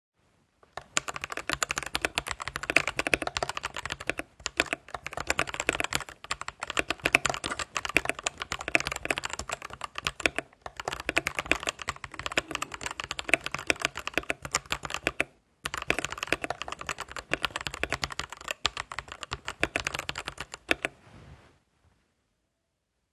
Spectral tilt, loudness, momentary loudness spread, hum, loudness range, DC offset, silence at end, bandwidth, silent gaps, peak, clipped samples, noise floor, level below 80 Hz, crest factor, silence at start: -2 dB/octave; -31 LUFS; 10 LU; none; 4 LU; under 0.1%; 1.75 s; 13 kHz; none; 0 dBFS; under 0.1%; -80 dBFS; -52 dBFS; 32 dB; 0.75 s